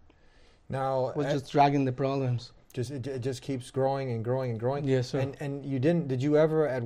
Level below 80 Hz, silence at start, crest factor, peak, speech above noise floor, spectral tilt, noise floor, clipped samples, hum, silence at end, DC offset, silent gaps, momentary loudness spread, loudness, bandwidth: -60 dBFS; 0.7 s; 18 dB; -10 dBFS; 30 dB; -7.5 dB/octave; -58 dBFS; under 0.1%; none; 0 s; under 0.1%; none; 11 LU; -29 LUFS; 11.5 kHz